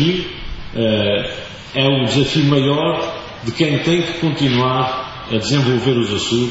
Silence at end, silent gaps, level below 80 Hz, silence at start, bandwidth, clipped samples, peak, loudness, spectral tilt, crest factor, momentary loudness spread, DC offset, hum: 0 s; none; -40 dBFS; 0 s; 8 kHz; under 0.1%; -2 dBFS; -17 LUFS; -5.5 dB/octave; 16 dB; 11 LU; under 0.1%; none